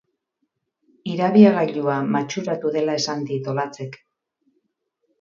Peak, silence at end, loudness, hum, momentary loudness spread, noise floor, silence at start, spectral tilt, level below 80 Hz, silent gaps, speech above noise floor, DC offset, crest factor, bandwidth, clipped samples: 0 dBFS; 1.25 s; -20 LUFS; none; 16 LU; -75 dBFS; 1.05 s; -6 dB/octave; -70 dBFS; none; 55 dB; under 0.1%; 22 dB; 7.4 kHz; under 0.1%